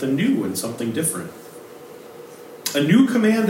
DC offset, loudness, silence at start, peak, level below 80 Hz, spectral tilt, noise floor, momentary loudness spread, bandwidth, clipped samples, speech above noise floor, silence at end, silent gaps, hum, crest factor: under 0.1%; -20 LUFS; 0 s; -4 dBFS; -72 dBFS; -5 dB/octave; -40 dBFS; 24 LU; 16.5 kHz; under 0.1%; 21 dB; 0 s; none; none; 18 dB